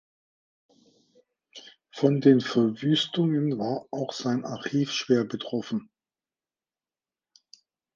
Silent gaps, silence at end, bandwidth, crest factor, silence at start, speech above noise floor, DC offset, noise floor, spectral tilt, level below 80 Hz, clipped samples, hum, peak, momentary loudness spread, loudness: none; 2.1 s; 7.4 kHz; 22 dB; 1.55 s; over 65 dB; under 0.1%; under -90 dBFS; -6 dB/octave; -74 dBFS; under 0.1%; none; -6 dBFS; 14 LU; -26 LUFS